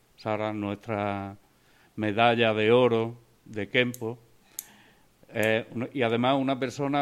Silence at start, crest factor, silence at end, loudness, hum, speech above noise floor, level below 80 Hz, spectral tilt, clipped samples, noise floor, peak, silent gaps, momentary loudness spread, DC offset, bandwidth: 0.2 s; 22 dB; 0 s; -27 LUFS; none; 35 dB; -68 dBFS; -5.5 dB/octave; under 0.1%; -61 dBFS; -6 dBFS; none; 19 LU; under 0.1%; 15.5 kHz